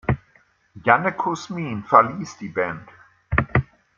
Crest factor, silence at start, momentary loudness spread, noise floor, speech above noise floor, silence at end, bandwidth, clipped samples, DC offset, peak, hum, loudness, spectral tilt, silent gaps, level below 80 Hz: 22 dB; 0.1 s; 12 LU; -59 dBFS; 38 dB; 0.35 s; 7.6 kHz; under 0.1%; under 0.1%; -2 dBFS; none; -22 LUFS; -6.5 dB/octave; none; -42 dBFS